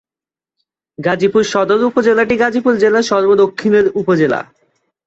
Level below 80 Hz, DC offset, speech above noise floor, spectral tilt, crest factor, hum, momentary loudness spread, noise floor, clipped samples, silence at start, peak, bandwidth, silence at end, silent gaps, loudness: -52 dBFS; under 0.1%; over 77 dB; -5.5 dB/octave; 12 dB; none; 4 LU; under -90 dBFS; under 0.1%; 1 s; -2 dBFS; 8 kHz; 0.65 s; none; -13 LUFS